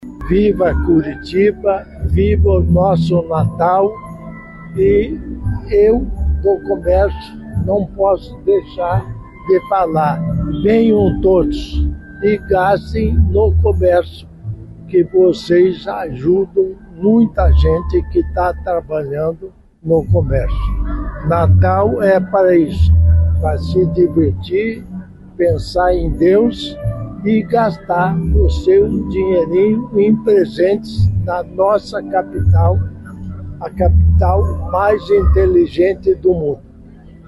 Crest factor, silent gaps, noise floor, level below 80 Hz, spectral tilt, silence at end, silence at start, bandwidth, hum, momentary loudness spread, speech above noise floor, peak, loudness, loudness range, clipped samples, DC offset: 10 dB; none; -38 dBFS; -22 dBFS; -9 dB/octave; 0.15 s; 0 s; 11.5 kHz; none; 11 LU; 25 dB; -4 dBFS; -15 LUFS; 3 LU; under 0.1%; under 0.1%